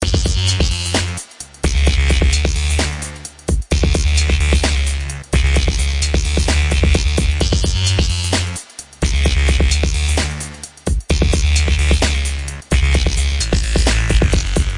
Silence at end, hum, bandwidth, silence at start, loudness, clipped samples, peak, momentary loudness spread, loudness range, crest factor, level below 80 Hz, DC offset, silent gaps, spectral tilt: 0 s; none; 11.5 kHz; 0 s; -17 LUFS; under 0.1%; -2 dBFS; 8 LU; 2 LU; 14 dB; -18 dBFS; under 0.1%; none; -4 dB/octave